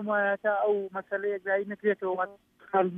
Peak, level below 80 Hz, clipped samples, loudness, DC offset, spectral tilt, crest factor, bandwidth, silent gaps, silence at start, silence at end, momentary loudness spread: -12 dBFS; -78 dBFS; under 0.1%; -29 LUFS; under 0.1%; -8.5 dB/octave; 18 dB; 3.8 kHz; none; 0 s; 0 s; 6 LU